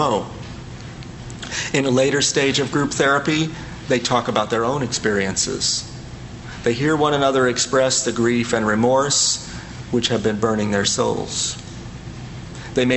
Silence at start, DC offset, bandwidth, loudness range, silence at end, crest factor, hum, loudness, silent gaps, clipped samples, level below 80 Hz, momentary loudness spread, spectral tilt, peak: 0 s; under 0.1%; 8.6 kHz; 3 LU; 0 s; 18 dB; none; -19 LUFS; none; under 0.1%; -44 dBFS; 18 LU; -3.5 dB/octave; -2 dBFS